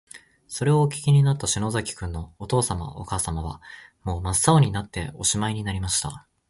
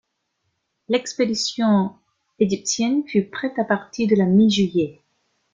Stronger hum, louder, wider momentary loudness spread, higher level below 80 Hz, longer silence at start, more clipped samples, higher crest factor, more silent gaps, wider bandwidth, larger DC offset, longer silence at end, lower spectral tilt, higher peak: neither; second, -24 LUFS vs -21 LUFS; first, 15 LU vs 8 LU; first, -40 dBFS vs -60 dBFS; second, 0.15 s vs 0.9 s; neither; first, 22 dB vs 16 dB; neither; first, 11.5 kHz vs 9.2 kHz; neither; second, 0.3 s vs 0.6 s; about the same, -4.5 dB/octave vs -5 dB/octave; about the same, -4 dBFS vs -4 dBFS